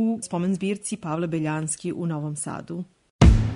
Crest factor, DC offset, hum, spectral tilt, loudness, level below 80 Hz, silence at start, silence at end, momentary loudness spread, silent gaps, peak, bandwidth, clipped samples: 20 dB; under 0.1%; none; -6 dB/octave; -25 LUFS; -28 dBFS; 0 s; 0 s; 15 LU; 3.10-3.19 s; -4 dBFS; 11 kHz; under 0.1%